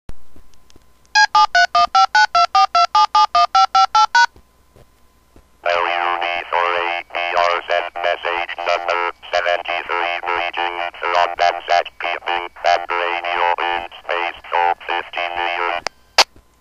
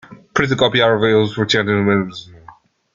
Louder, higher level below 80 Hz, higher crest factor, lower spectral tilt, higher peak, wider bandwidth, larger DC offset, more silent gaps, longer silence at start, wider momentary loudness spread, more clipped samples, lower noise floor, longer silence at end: about the same, -17 LUFS vs -16 LUFS; about the same, -52 dBFS vs -50 dBFS; about the same, 18 dB vs 16 dB; second, -0.5 dB/octave vs -5.5 dB/octave; about the same, 0 dBFS vs -2 dBFS; first, 14 kHz vs 7.6 kHz; neither; neither; about the same, 0.1 s vs 0.1 s; about the same, 9 LU vs 9 LU; neither; first, -54 dBFS vs -45 dBFS; about the same, 0.35 s vs 0.45 s